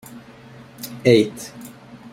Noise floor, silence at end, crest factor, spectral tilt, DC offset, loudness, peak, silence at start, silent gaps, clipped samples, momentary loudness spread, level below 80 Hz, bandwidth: -43 dBFS; 0.45 s; 20 dB; -5.5 dB/octave; under 0.1%; -18 LUFS; -2 dBFS; 0.15 s; none; under 0.1%; 25 LU; -62 dBFS; 16.5 kHz